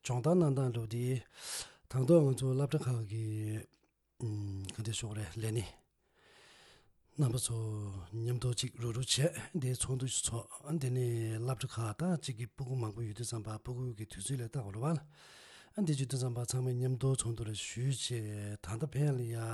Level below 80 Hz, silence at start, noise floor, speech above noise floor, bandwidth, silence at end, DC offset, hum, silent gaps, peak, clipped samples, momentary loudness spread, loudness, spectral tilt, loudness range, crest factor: -62 dBFS; 0.05 s; -70 dBFS; 35 dB; 12.5 kHz; 0 s; under 0.1%; none; none; -16 dBFS; under 0.1%; 11 LU; -36 LUFS; -5.5 dB/octave; 6 LU; 20 dB